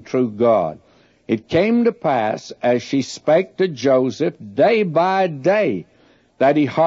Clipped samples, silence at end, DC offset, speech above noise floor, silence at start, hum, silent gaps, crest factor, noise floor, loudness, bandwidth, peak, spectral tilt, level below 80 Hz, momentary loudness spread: under 0.1%; 0 s; under 0.1%; 37 dB; 0 s; none; none; 14 dB; -54 dBFS; -18 LUFS; 7.8 kHz; -4 dBFS; -6.5 dB/octave; -58 dBFS; 7 LU